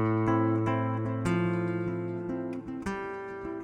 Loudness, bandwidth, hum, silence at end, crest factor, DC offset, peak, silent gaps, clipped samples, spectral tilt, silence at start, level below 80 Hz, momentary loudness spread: -31 LUFS; 9.8 kHz; none; 0 s; 16 dB; under 0.1%; -14 dBFS; none; under 0.1%; -8.5 dB/octave; 0 s; -54 dBFS; 10 LU